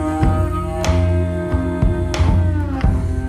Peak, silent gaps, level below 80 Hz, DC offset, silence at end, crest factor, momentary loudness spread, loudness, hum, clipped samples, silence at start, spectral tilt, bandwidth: -4 dBFS; none; -22 dBFS; under 0.1%; 0 s; 12 dB; 4 LU; -18 LUFS; none; under 0.1%; 0 s; -7 dB/octave; 11 kHz